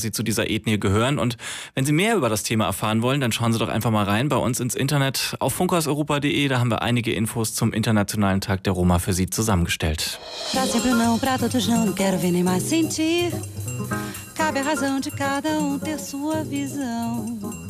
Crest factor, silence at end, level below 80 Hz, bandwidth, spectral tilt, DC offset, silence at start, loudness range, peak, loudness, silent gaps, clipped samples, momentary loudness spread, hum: 12 dB; 0 s; -44 dBFS; 16 kHz; -4.5 dB/octave; under 0.1%; 0 s; 3 LU; -10 dBFS; -22 LUFS; none; under 0.1%; 7 LU; none